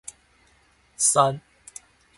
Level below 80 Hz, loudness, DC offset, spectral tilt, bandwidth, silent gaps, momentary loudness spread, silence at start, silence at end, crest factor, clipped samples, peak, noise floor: -64 dBFS; -20 LUFS; under 0.1%; -2.5 dB/octave; 12 kHz; none; 25 LU; 1 s; 0.8 s; 24 dB; under 0.1%; -4 dBFS; -61 dBFS